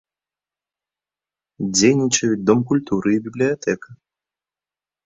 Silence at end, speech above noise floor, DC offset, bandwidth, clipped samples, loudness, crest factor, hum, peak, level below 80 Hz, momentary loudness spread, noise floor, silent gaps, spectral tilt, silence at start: 1.1 s; over 71 dB; under 0.1%; 8.4 kHz; under 0.1%; -19 LUFS; 20 dB; none; -2 dBFS; -58 dBFS; 9 LU; under -90 dBFS; none; -4.5 dB/octave; 1.6 s